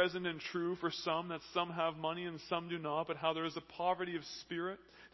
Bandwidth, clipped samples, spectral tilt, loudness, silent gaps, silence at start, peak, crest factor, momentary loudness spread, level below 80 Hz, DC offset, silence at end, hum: 6.2 kHz; under 0.1%; -5 dB/octave; -39 LUFS; none; 0 s; -18 dBFS; 20 dB; 6 LU; -74 dBFS; under 0.1%; 0.05 s; none